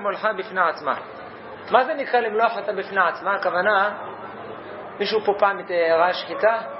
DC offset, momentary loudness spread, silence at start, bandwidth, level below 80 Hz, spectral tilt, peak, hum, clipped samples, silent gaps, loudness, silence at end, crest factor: under 0.1%; 16 LU; 0 s; 5.8 kHz; -70 dBFS; -7.5 dB/octave; 0 dBFS; none; under 0.1%; none; -21 LUFS; 0 s; 22 dB